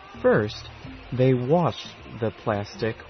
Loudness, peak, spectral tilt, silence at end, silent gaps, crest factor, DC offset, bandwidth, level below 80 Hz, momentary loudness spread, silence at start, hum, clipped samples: -24 LUFS; -8 dBFS; -7.5 dB/octave; 0 s; none; 16 dB; under 0.1%; 6.4 kHz; -50 dBFS; 16 LU; 0 s; none; under 0.1%